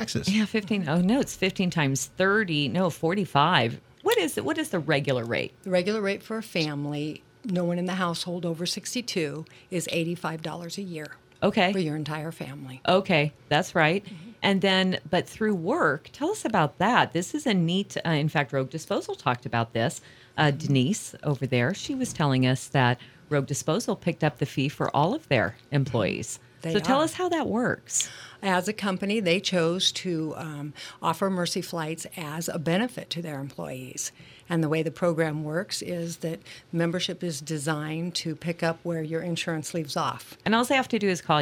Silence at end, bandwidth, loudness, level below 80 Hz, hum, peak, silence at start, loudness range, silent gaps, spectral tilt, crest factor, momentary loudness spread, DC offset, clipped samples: 0 s; 18.5 kHz; -27 LUFS; -62 dBFS; none; -4 dBFS; 0 s; 5 LU; none; -4.5 dB/octave; 22 dB; 10 LU; under 0.1%; under 0.1%